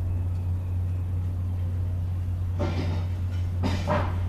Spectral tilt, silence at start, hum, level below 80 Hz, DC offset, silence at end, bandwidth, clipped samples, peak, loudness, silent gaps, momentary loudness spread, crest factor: -8 dB/octave; 0 s; none; -38 dBFS; under 0.1%; 0 s; 7.4 kHz; under 0.1%; -12 dBFS; -29 LUFS; none; 3 LU; 14 dB